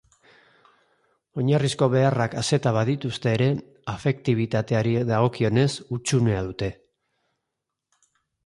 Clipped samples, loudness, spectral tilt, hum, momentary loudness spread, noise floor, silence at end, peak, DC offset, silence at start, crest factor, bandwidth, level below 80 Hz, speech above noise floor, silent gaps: under 0.1%; -23 LUFS; -6 dB/octave; none; 8 LU; -83 dBFS; 1.75 s; -6 dBFS; under 0.1%; 1.35 s; 18 dB; 11.5 kHz; -52 dBFS; 60 dB; none